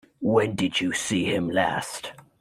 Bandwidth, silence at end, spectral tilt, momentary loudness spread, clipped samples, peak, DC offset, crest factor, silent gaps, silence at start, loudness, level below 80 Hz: 16 kHz; 0.2 s; -4 dB/octave; 11 LU; under 0.1%; -8 dBFS; under 0.1%; 16 dB; none; 0.2 s; -25 LUFS; -60 dBFS